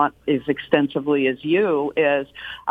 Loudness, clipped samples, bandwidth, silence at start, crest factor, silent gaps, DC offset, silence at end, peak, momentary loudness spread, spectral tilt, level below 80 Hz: -21 LUFS; under 0.1%; 4.7 kHz; 0 s; 18 dB; none; under 0.1%; 0 s; -2 dBFS; 5 LU; -8 dB/octave; -58 dBFS